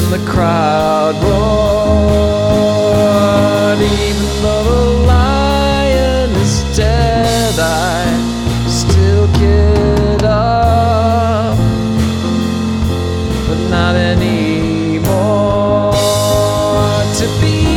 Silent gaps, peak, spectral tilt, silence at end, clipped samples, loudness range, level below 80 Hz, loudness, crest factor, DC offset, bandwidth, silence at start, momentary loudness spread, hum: none; 0 dBFS; -6 dB/octave; 0 s; under 0.1%; 3 LU; -20 dBFS; -12 LUFS; 10 dB; under 0.1%; 16.5 kHz; 0 s; 4 LU; none